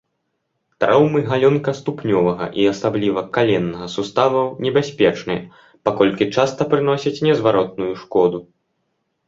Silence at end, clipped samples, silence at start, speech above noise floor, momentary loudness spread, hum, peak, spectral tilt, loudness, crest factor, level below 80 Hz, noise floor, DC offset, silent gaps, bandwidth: 0.85 s; under 0.1%; 0.8 s; 55 dB; 8 LU; none; 0 dBFS; -6.5 dB/octave; -18 LUFS; 18 dB; -54 dBFS; -73 dBFS; under 0.1%; none; 7.6 kHz